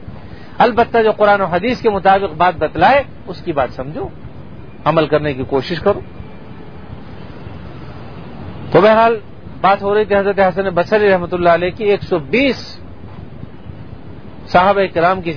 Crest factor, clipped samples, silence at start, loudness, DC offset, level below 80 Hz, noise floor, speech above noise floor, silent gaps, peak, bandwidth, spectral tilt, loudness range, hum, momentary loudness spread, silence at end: 16 dB; under 0.1%; 0 s; -14 LUFS; 2%; -40 dBFS; -34 dBFS; 20 dB; none; 0 dBFS; 5.4 kHz; -7.5 dB/octave; 6 LU; none; 23 LU; 0 s